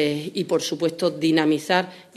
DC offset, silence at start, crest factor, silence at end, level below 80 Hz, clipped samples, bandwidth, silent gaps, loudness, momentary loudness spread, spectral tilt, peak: under 0.1%; 0 s; 20 dB; 0.15 s; -70 dBFS; under 0.1%; 13.5 kHz; none; -22 LUFS; 5 LU; -4.5 dB/octave; -4 dBFS